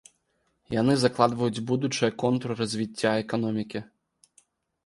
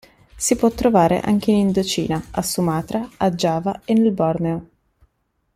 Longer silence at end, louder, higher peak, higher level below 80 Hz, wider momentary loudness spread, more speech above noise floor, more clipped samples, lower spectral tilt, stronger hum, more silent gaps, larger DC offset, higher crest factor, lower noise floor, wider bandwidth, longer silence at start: about the same, 1 s vs 0.9 s; second, -26 LUFS vs -19 LUFS; about the same, -4 dBFS vs -4 dBFS; second, -62 dBFS vs -46 dBFS; about the same, 8 LU vs 8 LU; about the same, 47 dB vs 50 dB; neither; about the same, -5.5 dB/octave vs -5.5 dB/octave; neither; neither; neither; first, 24 dB vs 16 dB; first, -73 dBFS vs -69 dBFS; second, 11.5 kHz vs 15.5 kHz; first, 0.7 s vs 0.35 s